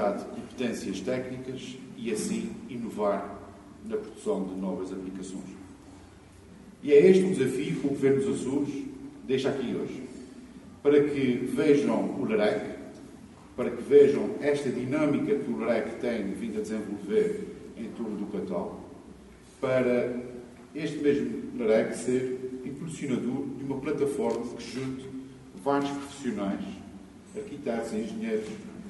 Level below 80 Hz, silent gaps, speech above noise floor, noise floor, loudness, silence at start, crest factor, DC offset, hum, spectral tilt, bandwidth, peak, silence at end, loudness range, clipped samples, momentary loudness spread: -60 dBFS; none; 23 dB; -51 dBFS; -28 LUFS; 0 s; 22 dB; under 0.1%; none; -6.5 dB/octave; 11.5 kHz; -6 dBFS; 0 s; 8 LU; under 0.1%; 19 LU